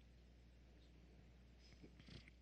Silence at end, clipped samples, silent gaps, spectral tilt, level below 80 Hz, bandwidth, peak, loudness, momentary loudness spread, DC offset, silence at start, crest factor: 0 s; under 0.1%; none; -5.5 dB/octave; -68 dBFS; 8.8 kHz; -48 dBFS; -66 LUFS; 7 LU; under 0.1%; 0 s; 18 dB